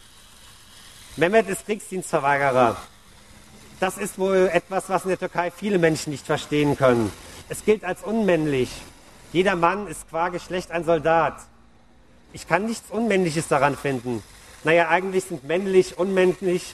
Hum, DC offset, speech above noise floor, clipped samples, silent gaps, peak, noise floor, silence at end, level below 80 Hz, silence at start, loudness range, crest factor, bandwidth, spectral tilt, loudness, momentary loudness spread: none; under 0.1%; 33 dB; under 0.1%; none; -2 dBFS; -55 dBFS; 0 s; -52 dBFS; 0.75 s; 3 LU; 20 dB; 14 kHz; -5 dB/octave; -22 LUFS; 10 LU